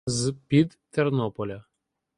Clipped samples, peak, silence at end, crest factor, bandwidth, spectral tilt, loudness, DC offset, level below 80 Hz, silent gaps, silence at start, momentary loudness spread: under 0.1%; -8 dBFS; 0.55 s; 20 dB; 11.5 kHz; -6 dB/octave; -26 LUFS; under 0.1%; -58 dBFS; none; 0.05 s; 12 LU